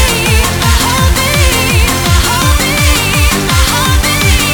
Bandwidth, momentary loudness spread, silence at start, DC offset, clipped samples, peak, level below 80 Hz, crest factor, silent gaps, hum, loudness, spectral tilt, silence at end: over 20 kHz; 1 LU; 0 s; under 0.1%; under 0.1%; 0 dBFS; -14 dBFS; 10 dB; none; none; -9 LUFS; -3.5 dB/octave; 0 s